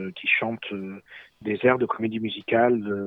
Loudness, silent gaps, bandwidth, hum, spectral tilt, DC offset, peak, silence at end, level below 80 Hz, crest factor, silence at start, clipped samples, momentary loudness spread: -24 LUFS; none; 4.6 kHz; none; -8 dB/octave; under 0.1%; -4 dBFS; 0 s; -66 dBFS; 20 dB; 0 s; under 0.1%; 14 LU